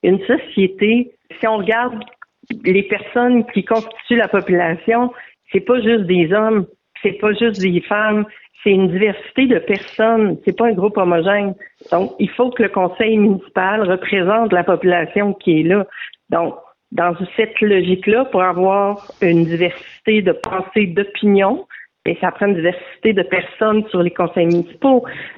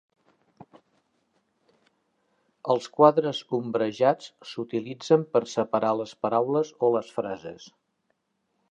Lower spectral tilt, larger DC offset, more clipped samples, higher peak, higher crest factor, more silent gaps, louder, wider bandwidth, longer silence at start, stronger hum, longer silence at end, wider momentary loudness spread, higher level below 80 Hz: first, -8 dB/octave vs -6 dB/octave; neither; neither; about the same, -4 dBFS vs -4 dBFS; second, 12 dB vs 24 dB; neither; first, -16 LUFS vs -25 LUFS; second, 7 kHz vs 8.8 kHz; second, 0.05 s vs 2.65 s; neither; second, 0.05 s vs 1.05 s; second, 7 LU vs 14 LU; first, -56 dBFS vs -76 dBFS